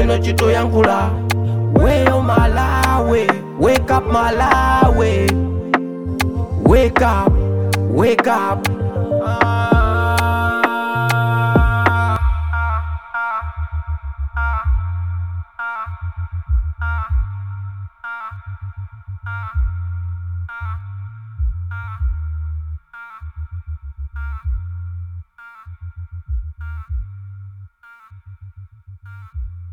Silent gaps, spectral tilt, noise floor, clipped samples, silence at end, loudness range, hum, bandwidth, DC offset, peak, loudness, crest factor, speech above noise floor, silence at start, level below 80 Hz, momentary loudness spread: none; -6.5 dB/octave; -44 dBFS; under 0.1%; 0 s; 15 LU; none; 17.5 kHz; under 0.1%; 0 dBFS; -18 LUFS; 18 dB; 30 dB; 0 s; -24 dBFS; 18 LU